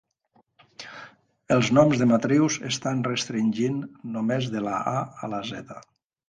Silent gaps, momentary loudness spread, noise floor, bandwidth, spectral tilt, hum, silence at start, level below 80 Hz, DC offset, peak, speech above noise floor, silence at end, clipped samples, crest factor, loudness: none; 21 LU; -66 dBFS; 9.8 kHz; -5.5 dB/octave; none; 0.8 s; -62 dBFS; under 0.1%; -6 dBFS; 42 dB; 0.45 s; under 0.1%; 20 dB; -24 LUFS